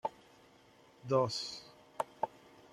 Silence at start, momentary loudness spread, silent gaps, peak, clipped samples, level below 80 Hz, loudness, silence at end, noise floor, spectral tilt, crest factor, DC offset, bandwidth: 0.05 s; 19 LU; none; -18 dBFS; under 0.1%; -76 dBFS; -37 LUFS; 0.45 s; -63 dBFS; -5 dB/octave; 22 dB; under 0.1%; 14 kHz